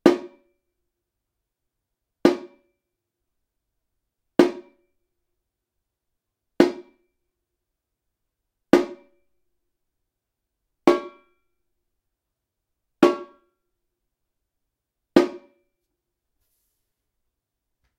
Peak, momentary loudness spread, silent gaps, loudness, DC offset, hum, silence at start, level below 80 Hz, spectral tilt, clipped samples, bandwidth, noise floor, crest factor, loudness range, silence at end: 0 dBFS; 13 LU; none; -22 LUFS; under 0.1%; none; 0.05 s; -64 dBFS; -5.5 dB/octave; under 0.1%; 13.5 kHz; -83 dBFS; 28 dB; 4 LU; 2.6 s